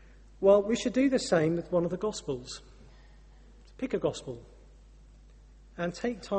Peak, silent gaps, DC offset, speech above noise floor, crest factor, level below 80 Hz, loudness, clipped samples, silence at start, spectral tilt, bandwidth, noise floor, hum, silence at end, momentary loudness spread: -12 dBFS; none; under 0.1%; 25 dB; 20 dB; -54 dBFS; -29 LUFS; under 0.1%; 0.4 s; -5.5 dB/octave; 8.4 kHz; -54 dBFS; none; 0 s; 20 LU